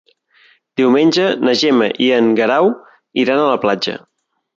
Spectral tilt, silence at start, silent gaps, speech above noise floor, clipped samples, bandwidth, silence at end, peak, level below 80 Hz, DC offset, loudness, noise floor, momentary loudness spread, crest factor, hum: -5 dB/octave; 0.75 s; none; 39 dB; under 0.1%; 7.6 kHz; 0.6 s; -2 dBFS; -62 dBFS; under 0.1%; -14 LUFS; -52 dBFS; 11 LU; 14 dB; none